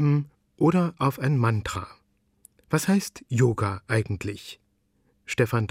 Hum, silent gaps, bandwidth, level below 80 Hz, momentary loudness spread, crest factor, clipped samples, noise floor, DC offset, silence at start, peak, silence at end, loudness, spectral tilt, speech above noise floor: none; none; 16 kHz; -54 dBFS; 12 LU; 18 dB; under 0.1%; -68 dBFS; under 0.1%; 0 s; -8 dBFS; 0.05 s; -25 LUFS; -6.5 dB/octave; 44 dB